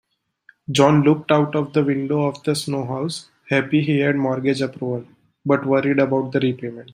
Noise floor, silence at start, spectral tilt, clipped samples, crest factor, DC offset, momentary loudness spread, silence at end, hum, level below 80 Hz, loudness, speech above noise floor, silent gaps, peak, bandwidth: -56 dBFS; 0.7 s; -6.5 dB/octave; under 0.1%; 18 dB; under 0.1%; 11 LU; 0.1 s; none; -62 dBFS; -20 LUFS; 36 dB; none; -2 dBFS; 15.5 kHz